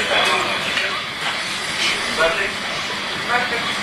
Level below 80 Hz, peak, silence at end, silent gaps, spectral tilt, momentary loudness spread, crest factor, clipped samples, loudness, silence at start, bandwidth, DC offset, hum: -50 dBFS; -4 dBFS; 0 s; none; -1.5 dB/octave; 6 LU; 16 dB; under 0.1%; -19 LUFS; 0 s; 14 kHz; under 0.1%; none